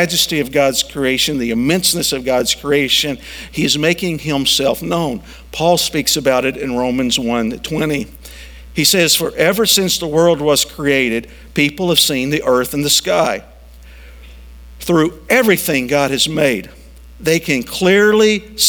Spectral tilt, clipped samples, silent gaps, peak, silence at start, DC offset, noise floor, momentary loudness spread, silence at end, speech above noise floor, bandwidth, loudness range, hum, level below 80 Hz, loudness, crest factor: -3 dB/octave; under 0.1%; none; 0 dBFS; 0 s; under 0.1%; -38 dBFS; 9 LU; 0 s; 23 dB; over 20 kHz; 3 LU; none; -40 dBFS; -14 LUFS; 16 dB